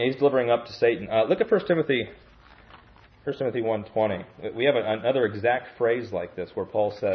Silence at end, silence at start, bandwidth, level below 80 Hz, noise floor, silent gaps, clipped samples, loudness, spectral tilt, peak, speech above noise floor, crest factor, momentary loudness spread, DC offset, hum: 0 s; 0 s; 6.2 kHz; -60 dBFS; -53 dBFS; none; under 0.1%; -25 LUFS; -7.5 dB/octave; -8 dBFS; 28 dB; 16 dB; 11 LU; under 0.1%; none